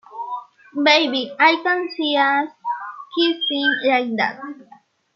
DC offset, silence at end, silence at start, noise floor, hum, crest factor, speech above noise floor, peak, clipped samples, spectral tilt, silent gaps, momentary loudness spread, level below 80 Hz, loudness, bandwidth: under 0.1%; 0.55 s; 0.1 s; -51 dBFS; none; 20 dB; 32 dB; 0 dBFS; under 0.1%; -3 dB/octave; none; 16 LU; -78 dBFS; -19 LUFS; 7 kHz